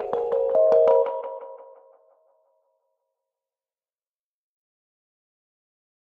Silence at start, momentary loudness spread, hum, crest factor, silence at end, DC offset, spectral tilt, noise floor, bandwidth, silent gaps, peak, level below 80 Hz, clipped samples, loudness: 0 s; 20 LU; none; 20 dB; 4.4 s; under 0.1%; -6.5 dB/octave; under -90 dBFS; 5 kHz; none; -8 dBFS; -70 dBFS; under 0.1%; -21 LUFS